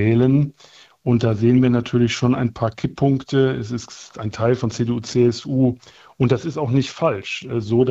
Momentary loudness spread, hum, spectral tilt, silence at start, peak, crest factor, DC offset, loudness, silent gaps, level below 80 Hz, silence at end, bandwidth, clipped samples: 10 LU; none; -7 dB/octave; 0 s; -4 dBFS; 16 dB; under 0.1%; -20 LUFS; none; -50 dBFS; 0 s; 8 kHz; under 0.1%